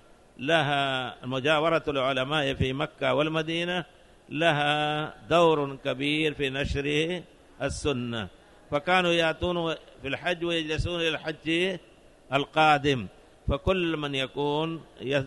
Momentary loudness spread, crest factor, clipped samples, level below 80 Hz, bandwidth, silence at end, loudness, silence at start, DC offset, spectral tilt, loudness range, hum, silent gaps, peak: 11 LU; 18 dB; under 0.1%; -46 dBFS; 11.5 kHz; 0 s; -27 LUFS; 0.4 s; under 0.1%; -5 dB/octave; 2 LU; none; none; -8 dBFS